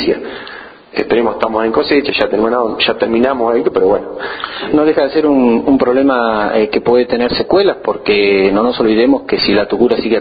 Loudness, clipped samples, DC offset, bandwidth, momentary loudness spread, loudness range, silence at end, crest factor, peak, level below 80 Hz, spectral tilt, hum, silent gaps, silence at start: -13 LUFS; under 0.1%; under 0.1%; 5 kHz; 9 LU; 2 LU; 0 s; 12 dB; 0 dBFS; -42 dBFS; -8 dB/octave; none; none; 0 s